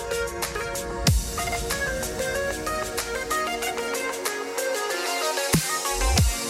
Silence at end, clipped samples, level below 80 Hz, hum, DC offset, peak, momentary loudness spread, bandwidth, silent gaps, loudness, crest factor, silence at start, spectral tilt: 0 s; under 0.1%; -34 dBFS; none; under 0.1%; -6 dBFS; 6 LU; 16.5 kHz; none; -26 LUFS; 20 dB; 0 s; -3 dB/octave